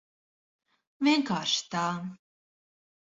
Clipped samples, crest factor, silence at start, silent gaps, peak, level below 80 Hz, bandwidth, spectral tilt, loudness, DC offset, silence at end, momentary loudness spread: under 0.1%; 20 dB; 1 s; none; -14 dBFS; -76 dBFS; 8 kHz; -3.5 dB/octave; -28 LUFS; under 0.1%; 0.9 s; 11 LU